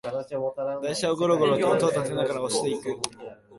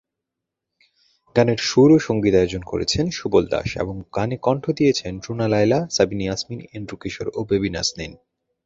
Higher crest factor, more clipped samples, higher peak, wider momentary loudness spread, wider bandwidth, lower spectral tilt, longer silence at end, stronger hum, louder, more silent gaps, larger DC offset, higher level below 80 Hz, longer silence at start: about the same, 22 dB vs 20 dB; neither; second, -4 dBFS vs 0 dBFS; second, 10 LU vs 13 LU; first, 11.5 kHz vs 7.8 kHz; about the same, -4.5 dB/octave vs -5.5 dB/octave; second, 0 s vs 0.5 s; neither; second, -26 LUFS vs -20 LUFS; neither; neither; second, -64 dBFS vs -44 dBFS; second, 0.05 s vs 1.35 s